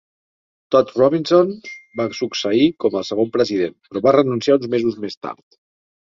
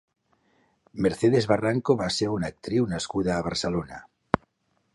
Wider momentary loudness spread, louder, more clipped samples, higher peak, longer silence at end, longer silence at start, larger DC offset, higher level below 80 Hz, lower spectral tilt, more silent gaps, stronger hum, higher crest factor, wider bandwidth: first, 14 LU vs 9 LU; first, -18 LUFS vs -26 LUFS; neither; about the same, 0 dBFS vs 0 dBFS; first, 0.8 s vs 0.55 s; second, 0.7 s vs 0.95 s; neither; second, -60 dBFS vs -52 dBFS; about the same, -6 dB/octave vs -5.5 dB/octave; first, 5.17-5.21 s vs none; neither; second, 18 dB vs 26 dB; second, 7.6 kHz vs 11.5 kHz